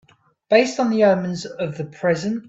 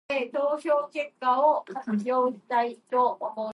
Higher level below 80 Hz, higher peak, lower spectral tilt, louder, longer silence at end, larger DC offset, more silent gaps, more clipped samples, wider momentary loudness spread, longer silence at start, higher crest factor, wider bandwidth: first, -62 dBFS vs -82 dBFS; first, -2 dBFS vs -10 dBFS; about the same, -5.5 dB/octave vs -6 dB/octave; first, -20 LUFS vs -26 LUFS; about the same, 0.05 s vs 0 s; neither; neither; neither; first, 11 LU vs 7 LU; first, 0.5 s vs 0.1 s; about the same, 18 dB vs 16 dB; second, 8 kHz vs 11.5 kHz